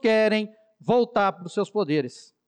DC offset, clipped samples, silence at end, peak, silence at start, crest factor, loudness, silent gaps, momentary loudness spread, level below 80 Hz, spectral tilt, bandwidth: under 0.1%; under 0.1%; 0.3 s; -12 dBFS; 0.05 s; 12 dB; -24 LUFS; none; 14 LU; -68 dBFS; -6 dB/octave; 9.6 kHz